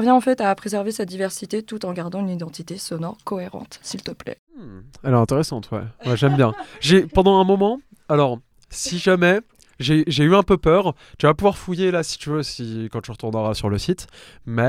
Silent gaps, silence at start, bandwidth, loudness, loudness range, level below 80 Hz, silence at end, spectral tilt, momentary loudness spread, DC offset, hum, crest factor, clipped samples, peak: 4.39-4.47 s; 0 s; 15 kHz; -20 LUFS; 10 LU; -44 dBFS; 0 s; -6 dB/octave; 15 LU; under 0.1%; none; 18 dB; under 0.1%; -2 dBFS